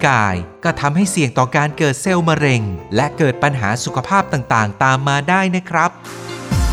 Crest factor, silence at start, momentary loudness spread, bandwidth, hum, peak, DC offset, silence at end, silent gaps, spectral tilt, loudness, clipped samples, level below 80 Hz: 16 dB; 0 s; 6 LU; 15 kHz; none; 0 dBFS; under 0.1%; 0 s; none; -5 dB/octave; -16 LUFS; under 0.1%; -34 dBFS